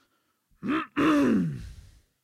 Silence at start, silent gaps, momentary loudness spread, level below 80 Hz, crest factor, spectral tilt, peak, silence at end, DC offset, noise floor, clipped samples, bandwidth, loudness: 0.65 s; none; 18 LU; -52 dBFS; 16 dB; -6.5 dB/octave; -12 dBFS; 0.45 s; under 0.1%; -72 dBFS; under 0.1%; 13.5 kHz; -26 LUFS